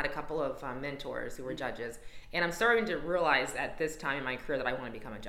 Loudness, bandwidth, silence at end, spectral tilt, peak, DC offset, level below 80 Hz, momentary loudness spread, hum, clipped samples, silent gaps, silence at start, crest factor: -33 LUFS; 16.5 kHz; 0 s; -4 dB/octave; -12 dBFS; under 0.1%; -52 dBFS; 12 LU; none; under 0.1%; none; 0 s; 22 dB